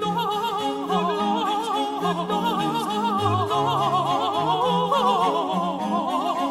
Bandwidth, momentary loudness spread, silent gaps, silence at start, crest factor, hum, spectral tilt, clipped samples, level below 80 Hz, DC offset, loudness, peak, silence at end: 16 kHz; 4 LU; none; 0 s; 14 dB; none; -5.5 dB/octave; under 0.1%; -62 dBFS; under 0.1%; -23 LUFS; -8 dBFS; 0 s